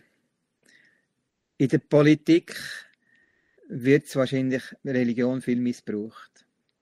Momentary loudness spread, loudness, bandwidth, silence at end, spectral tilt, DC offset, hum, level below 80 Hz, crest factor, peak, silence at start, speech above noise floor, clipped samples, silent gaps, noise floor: 16 LU; -24 LUFS; 15 kHz; 0.6 s; -7 dB/octave; under 0.1%; none; -70 dBFS; 20 dB; -6 dBFS; 1.6 s; 54 dB; under 0.1%; none; -78 dBFS